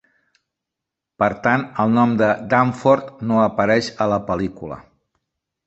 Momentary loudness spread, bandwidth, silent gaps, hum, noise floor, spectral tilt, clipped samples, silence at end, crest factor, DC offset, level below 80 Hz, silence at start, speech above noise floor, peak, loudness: 8 LU; 8.2 kHz; none; none; -84 dBFS; -7 dB/octave; under 0.1%; 0.85 s; 18 dB; under 0.1%; -52 dBFS; 1.2 s; 65 dB; -2 dBFS; -19 LUFS